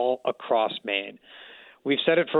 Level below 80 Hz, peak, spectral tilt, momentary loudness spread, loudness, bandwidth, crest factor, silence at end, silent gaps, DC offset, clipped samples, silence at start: -76 dBFS; -8 dBFS; -7 dB/octave; 23 LU; -26 LUFS; 4.4 kHz; 18 dB; 0 s; none; under 0.1%; under 0.1%; 0 s